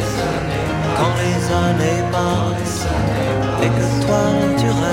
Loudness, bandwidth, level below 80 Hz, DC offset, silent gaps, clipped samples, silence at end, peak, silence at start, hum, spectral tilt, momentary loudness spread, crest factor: -18 LUFS; 16.5 kHz; -34 dBFS; under 0.1%; none; under 0.1%; 0 s; -4 dBFS; 0 s; none; -6 dB/octave; 4 LU; 12 dB